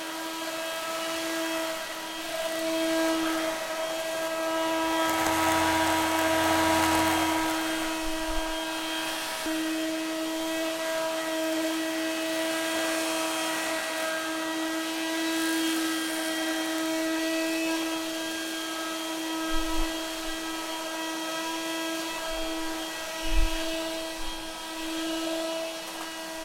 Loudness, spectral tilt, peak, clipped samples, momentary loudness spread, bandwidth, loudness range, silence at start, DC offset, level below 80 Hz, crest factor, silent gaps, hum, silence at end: -29 LUFS; -2.5 dB/octave; -10 dBFS; under 0.1%; 8 LU; 17 kHz; 7 LU; 0 s; under 0.1%; -42 dBFS; 18 dB; none; none; 0 s